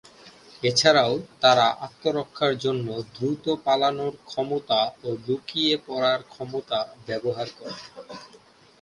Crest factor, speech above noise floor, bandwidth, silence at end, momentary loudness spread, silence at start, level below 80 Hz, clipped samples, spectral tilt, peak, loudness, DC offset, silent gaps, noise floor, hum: 22 dB; 25 dB; 11.5 kHz; 0.55 s; 15 LU; 0.25 s; -66 dBFS; under 0.1%; -4 dB/octave; -2 dBFS; -24 LUFS; under 0.1%; none; -49 dBFS; none